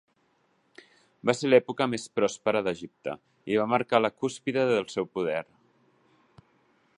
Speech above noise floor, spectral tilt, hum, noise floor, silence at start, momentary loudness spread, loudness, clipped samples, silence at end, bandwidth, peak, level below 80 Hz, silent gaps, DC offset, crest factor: 43 dB; -5 dB/octave; none; -69 dBFS; 1.25 s; 13 LU; -27 LUFS; under 0.1%; 1.55 s; 11 kHz; -6 dBFS; -70 dBFS; none; under 0.1%; 24 dB